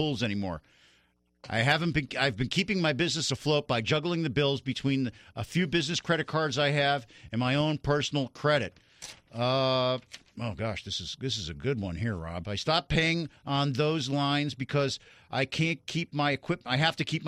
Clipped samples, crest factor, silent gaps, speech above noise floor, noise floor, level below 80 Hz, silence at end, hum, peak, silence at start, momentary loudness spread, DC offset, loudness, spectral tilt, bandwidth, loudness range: under 0.1%; 18 dB; none; 39 dB; -68 dBFS; -54 dBFS; 0 s; none; -10 dBFS; 0 s; 9 LU; under 0.1%; -29 LUFS; -5 dB/octave; 12 kHz; 3 LU